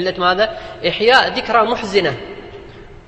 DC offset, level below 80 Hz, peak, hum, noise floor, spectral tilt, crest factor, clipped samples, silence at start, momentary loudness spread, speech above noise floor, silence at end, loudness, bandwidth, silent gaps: under 0.1%; -44 dBFS; 0 dBFS; none; -37 dBFS; -4 dB/octave; 18 dB; under 0.1%; 0 s; 19 LU; 21 dB; 0.05 s; -15 LUFS; 11 kHz; none